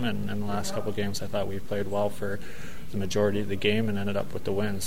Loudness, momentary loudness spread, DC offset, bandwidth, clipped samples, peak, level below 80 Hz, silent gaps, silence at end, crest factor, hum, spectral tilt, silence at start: -30 LUFS; 9 LU; 4%; 16 kHz; under 0.1%; -10 dBFS; -50 dBFS; none; 0 s; 18 dB; none; -5.5 dB/octave; 0 s